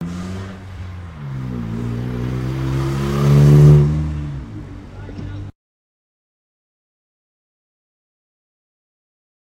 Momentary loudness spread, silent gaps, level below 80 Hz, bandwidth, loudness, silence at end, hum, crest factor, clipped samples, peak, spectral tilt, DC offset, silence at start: 23 LU; none; -32 dBFS; 8.8 kHz; -16 LUFS; 4.05 s; none; 20 dB; under 0.1%; 0 dBFS; -8.5 dB/octave; under 0.1%; 0 s